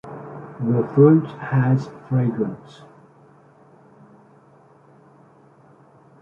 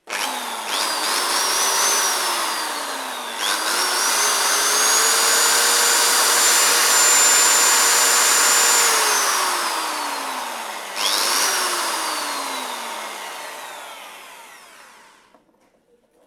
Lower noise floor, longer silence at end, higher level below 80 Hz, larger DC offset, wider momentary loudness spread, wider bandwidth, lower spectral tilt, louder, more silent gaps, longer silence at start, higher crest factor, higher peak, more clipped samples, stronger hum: second, -52 dBFS vs -60 dBFS; first, 3.65 s vs 1.6 s; first, -64 dBFS vs -82 dBFS; neither; first, 22 LU vs 15 LU; second, 6.8 kHz vs 19.5 kHz; first, -10.5 dB/octave vs 3 dB/octave; second, -20 LUFS vs -16 LUFS; neither; about the same, 0.05 s vs 0.05 s; about the same, 20 dB vs 18 dB; about the same, -2 dBFS vs -2 dBFS; neither; neither